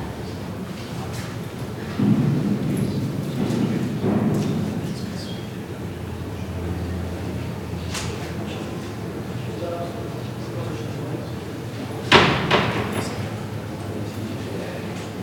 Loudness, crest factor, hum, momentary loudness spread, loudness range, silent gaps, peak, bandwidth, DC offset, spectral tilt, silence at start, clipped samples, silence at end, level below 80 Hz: -25 LUFS; 24 dB; none; 11 LU; 8 LU; none; 0 dBFS; 18 kHz; under 0.1%; -5.5 dB/octave; 0 s; under 0.1%; 0 s; -44 dBFS